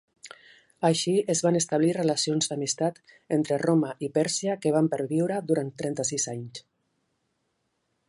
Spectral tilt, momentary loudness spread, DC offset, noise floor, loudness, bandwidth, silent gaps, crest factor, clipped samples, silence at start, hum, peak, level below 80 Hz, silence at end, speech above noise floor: -4.5 dB/octave; 7 LU; under 0.1%; -76 dBFS; -26 LUFS; 11.5 kHz; none; 18 dB; under 0.1%; 0.25 s; none; -8 dBFS; -74 dBFS; 1.5 s; 50 dB